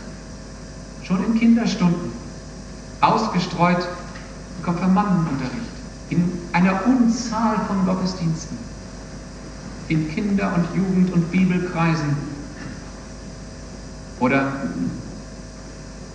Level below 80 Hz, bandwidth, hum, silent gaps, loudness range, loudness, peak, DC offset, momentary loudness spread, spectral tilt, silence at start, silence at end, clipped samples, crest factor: -40 dBFS; 9.6 kHz; none; none; 4 LU; -21 LUFS; -2 dBFS; under 0.1%; 19 LU; -6.5 dB/octave; 0 s; 0 s; under 0.1%; 20 dB